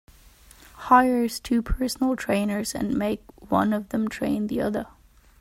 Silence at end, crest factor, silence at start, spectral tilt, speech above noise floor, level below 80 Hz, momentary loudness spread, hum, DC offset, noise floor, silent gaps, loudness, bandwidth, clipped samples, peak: 0.55 s; 20 dB; 0.75 s; -5 dB/octave; 28 dB; -42 dBFS; 10 LU; none; under 0.1%; -52 dBFS; none; -24 LUFS; 16 kHz; under 0.1%; -4 dBFS